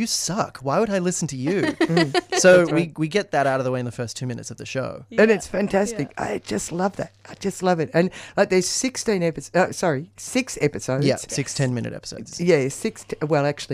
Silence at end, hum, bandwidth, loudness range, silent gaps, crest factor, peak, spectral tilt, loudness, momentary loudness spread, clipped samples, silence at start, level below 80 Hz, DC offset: 0 s; none; 15.5 kHz; 4 LU; none; 18 dB; -4 dBFS; -4.5 dB/octave; -22 LUFS; 11 LU; under 0.1%; 0 s; -54 dBFS; under 0.1%